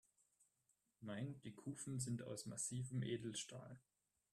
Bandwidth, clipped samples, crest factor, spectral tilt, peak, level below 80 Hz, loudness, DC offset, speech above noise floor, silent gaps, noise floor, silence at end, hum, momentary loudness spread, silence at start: 13.5 kHz; under 0.1%; 18 dB; -4.5 dB/octave; -32 dBFS; -80 dBFS; -48 LUFS; under 0.1%; 37 dB; none; -85 dBFS; 0.55 s; none; 12 LU; 1 s